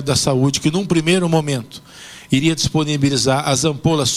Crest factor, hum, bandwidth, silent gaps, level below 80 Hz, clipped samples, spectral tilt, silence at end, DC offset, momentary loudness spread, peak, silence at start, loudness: 14 dB; none; 15.5 kHz; none; -44 dBFS; under 0.1%; -4.5 dB/octave; 0 s; under 0.1%; 13 LU; -4 dBFS; 0 s; -17 LUFS